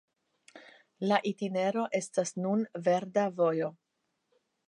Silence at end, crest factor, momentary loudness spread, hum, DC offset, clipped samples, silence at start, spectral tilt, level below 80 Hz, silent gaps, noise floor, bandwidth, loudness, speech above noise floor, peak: 0.95 s; 22 dB; 5 LU; none; under 0.1%; under 0.1%; 0.55 s; -5.5 dB/octave; -84 dBFS; none; -81 dBFS; 11 kHz; -31 LUFS; 51 dB; -10 dBFS